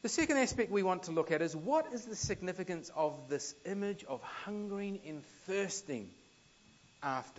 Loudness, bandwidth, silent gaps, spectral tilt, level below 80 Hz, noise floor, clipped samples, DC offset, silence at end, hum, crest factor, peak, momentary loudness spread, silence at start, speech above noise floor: -37 LUFS; 8.2 kHz; none; -4 dB/octave; -66 dBFS; -64 dBFS; under 0.1%; under 0.1%; 0.05 s; none; 20 dB; -18 dBFS; 11 LU; 0.05 s; 28 dB